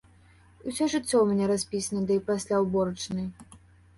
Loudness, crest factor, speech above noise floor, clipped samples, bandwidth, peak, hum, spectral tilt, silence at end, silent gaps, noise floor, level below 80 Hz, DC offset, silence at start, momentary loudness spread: -27 LUFS; 16 dB; 30 dB; under 0.1%; 11.5 kHz; -12 dBFS; none; -5 dB/octave; 0.4 s; none; -57 dBFS; -58 dBFS; under 0.1%; 0.65 s; 11 LU